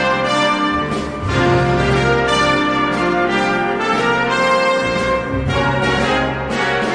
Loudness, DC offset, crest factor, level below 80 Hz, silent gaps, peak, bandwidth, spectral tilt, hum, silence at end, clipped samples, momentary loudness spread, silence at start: -16 LUFS; under 0.1%; 14 dB; -34 dBFS; none; -2 dBFS; 10.5 kHz; -5 dB/octave; none; 0 s; under 0.1%; 5 LU; 0 s